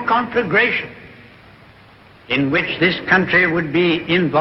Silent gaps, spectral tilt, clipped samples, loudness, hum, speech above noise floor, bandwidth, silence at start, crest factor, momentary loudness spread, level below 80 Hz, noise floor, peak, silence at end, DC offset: none; -7.5 dB/octave; under 0.1%; -16 LUFS; none; 29 dB; 6 kHz; 0 s; 18 dB; 6 LU; -50 dBFS; -46 dBFS; -2 dBFS; 0 s; under 0.1%